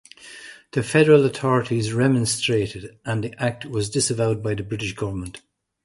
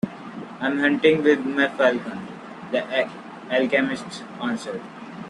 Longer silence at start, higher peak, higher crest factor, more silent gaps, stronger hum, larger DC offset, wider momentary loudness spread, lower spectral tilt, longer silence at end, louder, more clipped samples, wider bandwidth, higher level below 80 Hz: first, 0.2 s vs 0.05 s; about the same, -2 dBFS vs -4 dBFS; about the same, 20 dB vs 18 dB; neither; neither; neither; about the same, 18 LU vs 19 LU; about the same, -5 dB/octave vs -5.5 dB/octave; first, 0.45 s vs 0 s; about the same, -22 LUFS vs -22 LUFS; neither; about the same, 11.5 kHz vs 11 kHz; first, -50 dBFS vs -66 dBFS